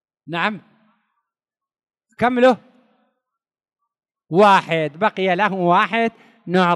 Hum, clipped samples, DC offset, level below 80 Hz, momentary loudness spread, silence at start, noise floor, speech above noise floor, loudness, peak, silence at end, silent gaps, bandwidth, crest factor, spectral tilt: none; under 0.1%; under 0.1%; -66 dBFS; 11 LU; 0.3 s; -87 dBFS; 71 dB; -18 LUFS; -2 dBFS; 0 s; none; 12 kHz; 18 dB; -6 dB/octave